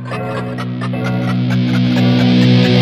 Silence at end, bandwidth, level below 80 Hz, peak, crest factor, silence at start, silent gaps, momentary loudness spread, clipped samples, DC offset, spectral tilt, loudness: 0 s; 8.4 kHz; -46 dBFS; 0 dBFS; 12 dB; 0 s; none; 11 LU; under 0.1%; under 0.1%; -7.5 dB/octave; -14 LUFS